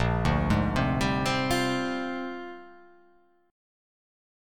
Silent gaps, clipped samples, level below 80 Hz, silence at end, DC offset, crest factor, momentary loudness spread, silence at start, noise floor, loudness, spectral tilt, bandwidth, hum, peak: none; under 0.1%; -40 dBFS; 1 s; 0.4%; 18 dB; 13 LU; 0 s; -63 dBFS; -27 LUFS; -5.5 dB/octave; 19 kHz; none; -12 dBFS